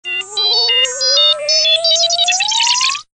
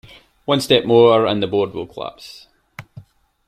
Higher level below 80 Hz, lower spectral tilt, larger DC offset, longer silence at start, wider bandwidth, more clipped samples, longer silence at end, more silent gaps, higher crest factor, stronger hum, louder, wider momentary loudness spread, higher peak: second, -68 dBFS vs -56 dBFS; second, 3.5 dB/octave vs -5.5 dB/octave; neither; second, 0.05 s vs 0.5 s; second, 10 kHz vs 15 kHz; neither; second, 0.15 s vs 0.45 s; neither; second, 10 dB vs 18 dB; first, 60 Hz at -55 dBFS vs none; first, -11 LUFS vs -16 LUFS; second, 3 LU vs 26 LU; second, -4 dBFS vs 0 dBFS